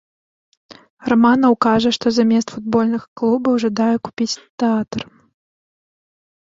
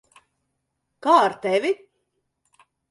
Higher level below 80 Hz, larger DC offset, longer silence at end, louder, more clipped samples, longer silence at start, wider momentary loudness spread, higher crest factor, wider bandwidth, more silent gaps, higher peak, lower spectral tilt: first, -56 dBFS vs -74 dBFS; neither; first, 1.45 s vs 1.15 s; first, -17 LUFS vs -21 LUFS; neither; about the same, 1.05 s vs 1.05 s; about the same, 9 LU vs 11 LU; about the same, 16 dB vs 20 dB; second, 7.6 kHz vs 11.5 kHz; first, 3.08-3.16 s, 4.49-4.58 s vs none; about the same, -2 dBFS vs -4 dBFS; about the same, -5 dB/octave vs -4.5 dB/octave